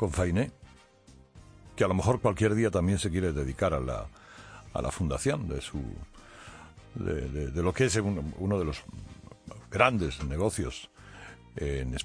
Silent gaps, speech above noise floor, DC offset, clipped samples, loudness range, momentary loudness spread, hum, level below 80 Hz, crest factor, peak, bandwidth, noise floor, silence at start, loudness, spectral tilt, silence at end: none; 28 dB; under 0.1%; under 0.1%; 5 LU; 22 LU; none; -42 dBFS; 24 dB; -6 dBFS; 10.5 kHz; -57 dBFS; 0 s; -30 LUFS; -5.5 dB/octave; 0 s